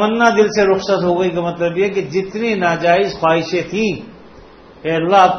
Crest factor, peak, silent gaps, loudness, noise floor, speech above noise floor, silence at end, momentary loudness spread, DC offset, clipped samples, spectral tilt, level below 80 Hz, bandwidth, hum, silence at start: 16 dB; 0 dBFS; none; -16 LUFS; -41 dBFS; 26 dB; 0 s; 8 LU; under 0.1%; under 0.1%; -5.5 dB/octave; -48 dBFS; 6.6 kHz; none; 0 s